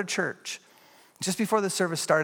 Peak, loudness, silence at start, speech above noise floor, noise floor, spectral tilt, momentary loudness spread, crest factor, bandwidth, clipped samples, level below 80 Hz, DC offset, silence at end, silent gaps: -8 dBFS; -28 LUFS; 0 s; 30 dB; -57 dBFS; -3.5 dB/octave; 12 LU; 20 dB; 17.5 kHz; under 0.1%; -76 dBFS; under 0.1%; 0 s; none